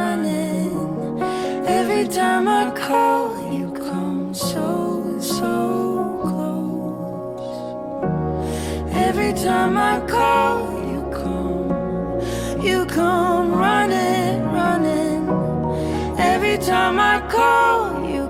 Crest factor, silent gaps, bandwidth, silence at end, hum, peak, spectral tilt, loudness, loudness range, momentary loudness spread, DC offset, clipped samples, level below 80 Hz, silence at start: 16 dB; none; 16.5 kHz; 0 s; none; -4 dBFS; -5.5 dB/octave; -20 LUFS; 5 LU; 8 LU; under 0.1%; under 0.1%; -40 dBFS; 0 s